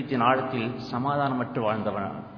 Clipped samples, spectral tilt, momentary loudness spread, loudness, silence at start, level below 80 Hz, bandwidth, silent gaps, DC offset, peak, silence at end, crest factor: under 0.1%; -8 dB/octave; 7 LU; -27 LUFS; 0 s; -62 dBFS; 5.4 kHz; none; under 0.1%; -8 dBFS; 0 s; 20 dB